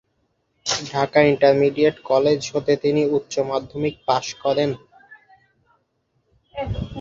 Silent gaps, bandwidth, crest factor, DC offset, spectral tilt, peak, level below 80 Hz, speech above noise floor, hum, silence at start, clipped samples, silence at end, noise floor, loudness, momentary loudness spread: none; 7.8 kHz; 20 dB; under 0.1%; -5 dB/octave; -2 dBFS; -46 dBFS; 50 dB; none; 0.65 s; under 0.1%; 0 s; -69 dBFS; -20 LUFS; 12 LU